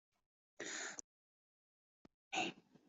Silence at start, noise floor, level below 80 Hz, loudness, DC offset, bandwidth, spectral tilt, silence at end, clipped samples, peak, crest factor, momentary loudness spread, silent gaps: 0.6 s; under -90 dBFS; under -90 dBFS; -45 LUFS; under 0.1%; 8.2 kHz; -1 dB/octave; 0.3 s; under 0.1%; -28 dBFS; 24 dB; 9 LU; 1.04-2.05 s, 2.14-2.31 s